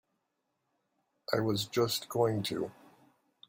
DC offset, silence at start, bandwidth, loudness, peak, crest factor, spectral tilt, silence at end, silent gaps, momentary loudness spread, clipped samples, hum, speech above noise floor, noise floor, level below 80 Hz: under 0.1%; 1.3 s; 16.5 kHz; -32 LUFS; -14 dBFS; 22 dB; -5 dB/octave; 0.75 s; none; 9 LU; under 0.1%; none; 50 dB; -82 dBFS; -70 dBFS